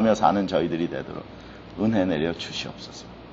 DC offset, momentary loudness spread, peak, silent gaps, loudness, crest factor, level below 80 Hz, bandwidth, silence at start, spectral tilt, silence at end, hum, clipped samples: under 0.1%; 19 LU; -4 dBFS; none; -25 LUFS; 20 dB; -52 dBFS; 8 kHz; 0 s; -5 dB/octave; 0 s; none; under 0.1%